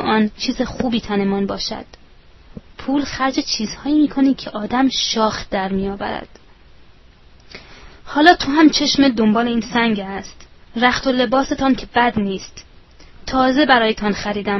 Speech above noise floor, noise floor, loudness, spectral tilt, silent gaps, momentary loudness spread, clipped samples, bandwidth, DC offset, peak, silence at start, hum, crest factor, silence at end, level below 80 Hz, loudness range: 29 dB; -46 dBFS; -17 LUFS; -4.5 dB/octave; none; 15 LU; under 0.1%; 6.2 kHz; under 0.1%; 0 dBFS; 0 s; none; 18 dB; 0 s; -42 dBFS; 6 LU